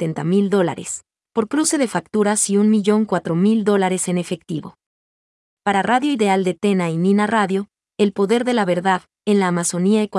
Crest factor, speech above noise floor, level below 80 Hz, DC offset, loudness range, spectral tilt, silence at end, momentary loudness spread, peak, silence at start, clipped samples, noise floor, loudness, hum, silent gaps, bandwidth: 16 dB; over 72 dB; -66 dBFS; under 0.1%; 3 LU; -5 dB/octave; 0 s; 10 LU; -4 dBFS; 0 s; under 0.1%; under -90 dBFS; -18 LUFS; none; 4.86-5.57 s; 12 kHz